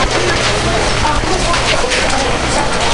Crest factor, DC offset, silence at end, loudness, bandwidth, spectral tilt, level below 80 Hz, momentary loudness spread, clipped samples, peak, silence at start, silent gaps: 12 dB; under 0.1%; 0 s; -13 LUFS; 11.5 kHz; -3 dB/octave; -22 dBFS; 2 LU; under 0.1%; 0 dBFS; 0 s; none